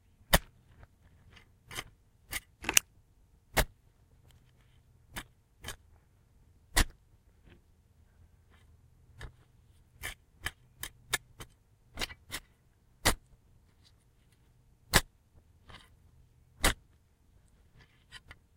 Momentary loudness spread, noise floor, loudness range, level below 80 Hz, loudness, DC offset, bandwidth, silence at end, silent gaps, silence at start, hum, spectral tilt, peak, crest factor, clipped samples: 25 LU; -66 dBFS; 8 LU; -44 dBFS; -34 LUFS; under 0.1%; 16 kHz; 0.4 s; none; 0.3 s; none; -2 dB/octave; -2 dBFS; 36 dB; under 0.1%